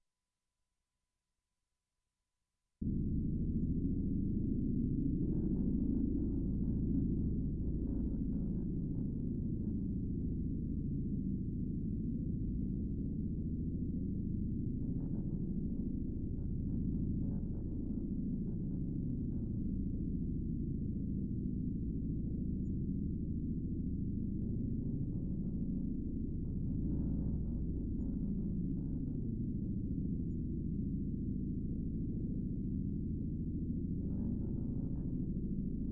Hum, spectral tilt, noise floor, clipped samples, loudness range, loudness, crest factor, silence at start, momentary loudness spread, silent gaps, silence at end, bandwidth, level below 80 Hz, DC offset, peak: none; -17.5 dB/octave; under -90 dBFS; under 0.1%; 3 LU; -39 LUFS; 14 dB; 2.8 s; 4 LU; none; 0 s; 1.3 kHz; -44 dBFS; under 0.1%; -24 dBFS